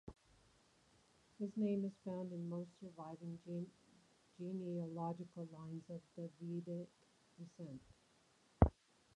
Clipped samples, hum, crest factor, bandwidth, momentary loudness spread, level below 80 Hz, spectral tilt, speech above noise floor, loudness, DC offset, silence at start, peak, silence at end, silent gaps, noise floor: under 0.1%; none; 32 dB; 10.5 kHz; 17 LU; -54 dBFS; -9 dB/octave; 27 dB; -45 LUFS; under 0.1%; 0.05 s; -14 dBFS; 0.45 s; none; -74 dBFS